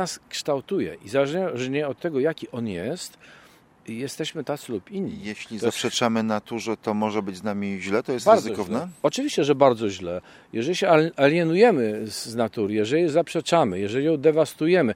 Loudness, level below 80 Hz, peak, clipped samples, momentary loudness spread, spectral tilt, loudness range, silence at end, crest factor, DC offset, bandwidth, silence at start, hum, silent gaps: -24 LUFS; -66 dBFS; -2 dBFS; under 0.1%; 13 LU; -5 dB/octave; 9 LU; 0 s; 22 dB; under 0.1%; 16.5 kHz; 0 s; none; none